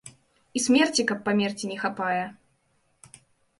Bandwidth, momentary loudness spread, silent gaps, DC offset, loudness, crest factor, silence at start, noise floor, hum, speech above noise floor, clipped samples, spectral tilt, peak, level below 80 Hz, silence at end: 11.5 kHz; 10 LU; none; under 0.1%; -25 LUFS; 20 dB; 0.05 s; -69 dBFS; none; 44 dB; under 0.1%; -3.5 dB/octave; -8 dBFS; -68 dBFS; 1.25 s